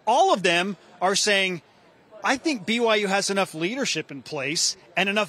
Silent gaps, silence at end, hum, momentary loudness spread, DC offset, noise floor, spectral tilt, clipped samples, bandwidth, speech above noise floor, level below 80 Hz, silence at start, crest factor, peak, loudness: none; 0 s; none; 10 LU; under 0.1%; -52 dBFS; -2.5 dB/octave; under 0.1%; 15 kHz; 28 dB; -74 dBFS; 0.05 s; 18 dB; -6 dBFS; -23 LUFS